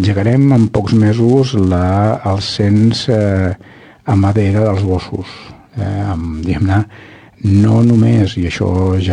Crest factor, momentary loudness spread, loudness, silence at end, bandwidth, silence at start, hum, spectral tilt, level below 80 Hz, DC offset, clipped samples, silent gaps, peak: 12 dB; 12 LU; -13 LUFS; 0 s; 9.8 kHz; 0 s; none; -7.5 dB/octave; -36 dBFS; under 0.1%; under 0.1%; none; 0 dBFS